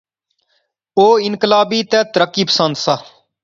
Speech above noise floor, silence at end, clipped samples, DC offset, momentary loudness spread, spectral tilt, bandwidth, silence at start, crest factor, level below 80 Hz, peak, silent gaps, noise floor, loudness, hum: 52 dB; 0.4 s; under 0.1%; under 0.1%; 7 LU; -4 dB/octave; 7.6 kHz; 0.95 s; 16 dB; -62 dBFS; 0 dBFS; none; -66 dBFS; -14 LUFS; none